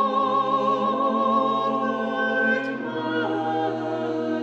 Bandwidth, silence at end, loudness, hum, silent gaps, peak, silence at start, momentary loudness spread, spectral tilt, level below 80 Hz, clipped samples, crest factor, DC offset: 8 kHz; 0 s; -23 LUFS; none; none; -10 dBFS; 0 s; 5 LU; -6.5 dB/octave; -74 dBFS; under 0.1%; 14 dB; under 0.1%